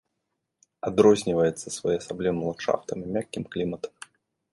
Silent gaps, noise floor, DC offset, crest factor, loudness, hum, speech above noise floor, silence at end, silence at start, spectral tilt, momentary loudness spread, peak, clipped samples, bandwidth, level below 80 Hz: none; -80 dBFS; under 0.1%; 22 dB; -26 LUFS; none; 55 dB; 0.65 s; 0.85 s; -5.5 dB/octave; 13 LU; -4 dBFS; under 0.1%; 11.5 kHz; -58 dBFS